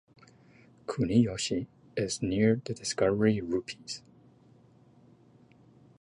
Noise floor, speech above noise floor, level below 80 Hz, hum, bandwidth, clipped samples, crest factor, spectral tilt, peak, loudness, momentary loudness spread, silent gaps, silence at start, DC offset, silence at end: -59 dBFS; 31 dB; -58 dBFS; none; 11 kHz; under 0.1%; 20 dB; -5.5 dB/octave; -12 dBFS; -30 LUFS; 14 LU; none; 0.9 s; under 0.1%; 2.05 s